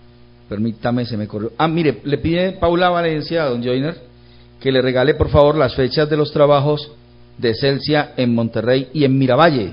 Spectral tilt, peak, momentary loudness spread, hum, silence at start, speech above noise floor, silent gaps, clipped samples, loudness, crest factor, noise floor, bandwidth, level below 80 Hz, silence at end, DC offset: -10 dB/octave; 0 dBFS; 10 LU; 60 Hz at -45 dBFS; 0.5 s; 29 dB; none; under 0.1%; -17 LUFS; 16 dB; -45 dBFS; 5.4 kHz; -38 dBFS; 0 s; under 0.1%